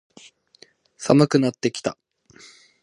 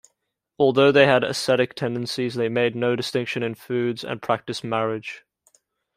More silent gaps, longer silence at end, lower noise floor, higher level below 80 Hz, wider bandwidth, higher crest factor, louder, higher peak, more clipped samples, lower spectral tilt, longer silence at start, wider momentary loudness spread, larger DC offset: neither; first, 0.9 s vs 0.75 s; second, -55 dBFS vs -77 dBFS; about the same, -62 dBFS vs -66 dBFS; second, 11.5 kHz vs 15 kHz; about the same, 24 dB vs 20 dB; about the same, -21 LUFS vs -22 LUFS; about the same, 0 dBFS vs -2 dBFS; neither; about the same, -6 dB/octave vs -5 dB/octave; first, 1 s vs 0.6 s; first, 14 LU vs 11 LU; neither